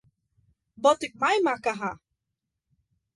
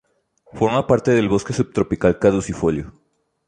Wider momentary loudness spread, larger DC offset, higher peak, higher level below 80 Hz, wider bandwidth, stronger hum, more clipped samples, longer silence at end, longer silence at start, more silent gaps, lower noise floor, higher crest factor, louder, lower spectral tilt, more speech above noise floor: first, 11 LU vs 6 LU; neither; second, -8 dBFS vs -2 dBFS; second, -68 dBFS vs -42 dBFS; first, 11.5 kHz vs 10 kHz; neither; neither; first, 1.2 s vs 0.6 s; first, 0.8 s vs 0.55 s; neither; first, -84 dBFS vs -57 dBFS; about the same, 20 dB vs 18 dB; second, -25 LUFS vs -19 LUFS; second, -3.5 dB/octave vs -6.5 dB/octave; first, 59 dB vs 39 dB